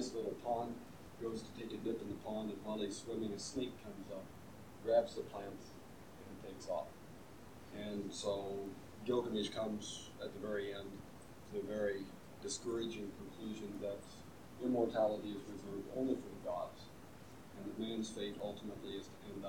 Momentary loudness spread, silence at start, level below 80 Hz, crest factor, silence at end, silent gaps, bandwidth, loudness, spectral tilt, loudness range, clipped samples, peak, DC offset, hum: 18 LU; 0 s; -68 dBFS; 22 dB; 0 s; none; 19 kHz; -43 LUFS; -5 dB/octave; 3 LU; under 0.1%; -20 dBFS; under 0.1%; none